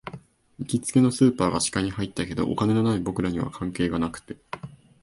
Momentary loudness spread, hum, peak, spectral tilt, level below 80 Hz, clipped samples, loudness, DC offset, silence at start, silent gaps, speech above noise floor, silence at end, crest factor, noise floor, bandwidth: 18 LU; none; -6 dBFS; -5.5 dB/octave; -48 dBFS; under 0.1%; -24 LUFS; under 0.1%; 0.05 s; none; 22 dB; 0.3 s; 18 dB; -46 dBFS; 11.5 kHz